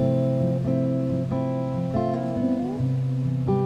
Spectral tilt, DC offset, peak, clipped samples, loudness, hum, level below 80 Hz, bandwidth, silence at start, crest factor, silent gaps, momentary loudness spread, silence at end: -10 dB/octave; under 0.1%; -10 dBFS; under 0.1%; -25 LUFS; none; -50 dBFS; 6.4 kHz; 0 s; 14 dB; none; 3 LU; 0 s